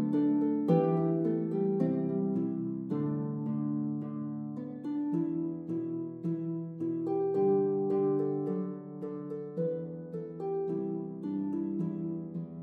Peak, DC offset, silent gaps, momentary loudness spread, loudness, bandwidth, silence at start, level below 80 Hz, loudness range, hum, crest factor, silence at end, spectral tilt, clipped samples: -14 dBFS; under 0.1%; none; 11 LU; -33 LUFS; 4.4 kHz; 0 s; -78 dBFS; 5 LU; none; 18 dB; 0 s; -12 dB/octave; under 0.1%